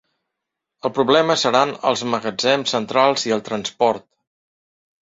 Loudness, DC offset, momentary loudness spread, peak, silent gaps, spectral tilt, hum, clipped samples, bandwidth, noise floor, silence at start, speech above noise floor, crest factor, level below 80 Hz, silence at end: -19 LUFS; under 0.1%; 8 LU; -2 dBFS; none; -3.5 dB/octave; none; under 0.1%; 8 kHz; -82 dBFS; 0.85 s; 63 dB; 20 dB; -64 dBFS; 1.05 s